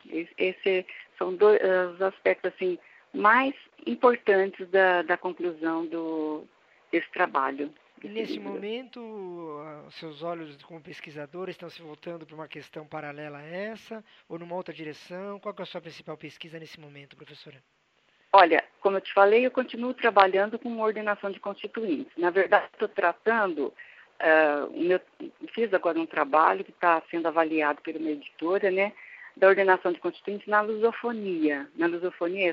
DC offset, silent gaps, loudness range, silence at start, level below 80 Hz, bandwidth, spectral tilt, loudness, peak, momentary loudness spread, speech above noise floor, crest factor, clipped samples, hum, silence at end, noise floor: under 0.1%; none; 15 LU; 0.05 s; -82 dBFS; 6.6 kHz; -6.5 dB/octave; -26 LUFS; -2 dBFS; 21 LU; 40 dB; 24 dB; under 0.1%; none; 0 s; -67 dBFS